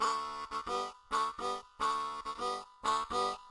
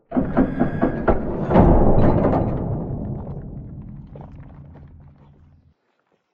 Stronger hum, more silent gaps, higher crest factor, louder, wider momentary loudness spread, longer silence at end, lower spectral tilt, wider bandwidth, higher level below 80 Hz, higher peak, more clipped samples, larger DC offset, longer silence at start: neither; neither; about the same, 16 dB vs 18 dB; second, -36 LUFS vs -20 LUFS; second, 6 LU vs 24 LU; second, 0 s vs 1.45 s; second, -2 dB/octave vs -11.5 dB/octave; first, 11.5 kHz vs 4.2 kHz; second, -64 dBFS vs -26 dBFS; second, -20 dBFS vs -2 dBFS; neither; neither; about the same, 0 s vs 0.1 s